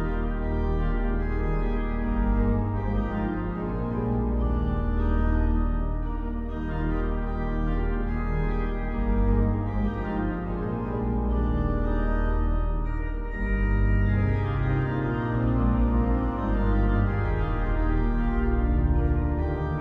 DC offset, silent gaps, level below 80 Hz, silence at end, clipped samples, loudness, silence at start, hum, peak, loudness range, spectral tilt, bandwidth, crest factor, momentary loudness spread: under 0.1%; none; -26 dBFS; 0 s; under 0.1%; -27 LUFS; 0 s; none; -12 dBFS; 3 LU; -10.5 dB/octave; 4.2 kHz; 12 dB; 6 LU